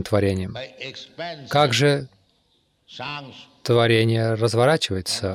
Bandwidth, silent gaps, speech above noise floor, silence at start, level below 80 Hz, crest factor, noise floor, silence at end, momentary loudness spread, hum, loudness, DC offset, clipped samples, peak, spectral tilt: 14.5 kHz; none; 44 dB; 0 s; -56 dBFS; 16 dB; -65 dBFS; 0 s; 17 LU; none; -21 LUFS; under 0.1%; under 0.1%; -6 dBFS; -5 dB/octave